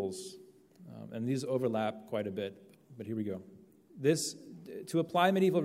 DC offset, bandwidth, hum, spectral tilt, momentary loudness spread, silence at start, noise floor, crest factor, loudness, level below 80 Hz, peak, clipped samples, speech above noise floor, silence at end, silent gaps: under 0.1%; 16 kHz; none; -5.5 dB/octave; 19 LU; 0 s; -56 dBFS; 22 dB; -33 LUFS; -80 dBFS; -14 dBFS; under 0.1%; 23 dB; 0 s; none